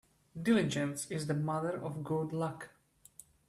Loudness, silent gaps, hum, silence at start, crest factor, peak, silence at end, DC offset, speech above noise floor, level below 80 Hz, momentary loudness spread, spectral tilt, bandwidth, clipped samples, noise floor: -35 LUFS; none; none; 0.35 s; 18 dB; -18 dBFS; 0.8 s; under 0.1%; 26 dB; -70 dBFS; 21 LU; -6 dB/octave; 15 kHz; under 0.1%; -60 dBFS